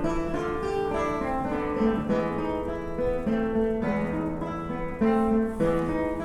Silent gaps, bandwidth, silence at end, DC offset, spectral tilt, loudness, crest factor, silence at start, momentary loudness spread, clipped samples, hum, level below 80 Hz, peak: none; 11.5 kHz; 0 s; under 0.1%; -8 dB/octave; -27 LUFS; 14 dB; 0 s; 6 LU; under 0.1%; none; -40 dBFS; -12 dBFS